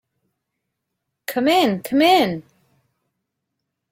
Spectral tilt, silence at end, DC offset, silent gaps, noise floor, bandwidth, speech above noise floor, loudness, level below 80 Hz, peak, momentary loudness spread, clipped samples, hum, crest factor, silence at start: -4.5 dB/octave; 1.5 s; under 0.1%; none; -79 dBFS; 16.5 kHz; 62 dB; -18 LUFS; -66 dBFS; -4 dBFS; 16 LU; under 0.1%; none; 18 dB; 1.3 s